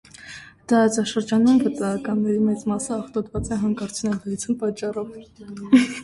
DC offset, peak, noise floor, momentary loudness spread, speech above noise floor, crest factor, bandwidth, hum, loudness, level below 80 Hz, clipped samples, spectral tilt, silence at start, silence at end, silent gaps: under 0.1%; -4 dBFS; -42 dBFS; 20 LU; 21 dB; 18 dB; 11.5 kHz; none; -22 LUFS; -48 dBFS; under 0.1%; -5.5 dB/octave; 0.2 s; 0 s; none